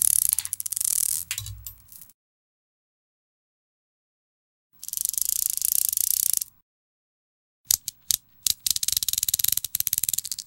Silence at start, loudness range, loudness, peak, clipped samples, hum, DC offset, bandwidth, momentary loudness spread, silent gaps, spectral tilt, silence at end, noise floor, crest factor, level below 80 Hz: 0 s; 9 LU; -23 LUFS; 0 dBFS; under 0.1%; none; under 0.1%; 17 kHz; 11 LU; 2.14-4.70 s, 6.62-7.64 s; 2.5 dB/octave; 0.05 s; -44 dBFS; 28 dB; -56 dBFS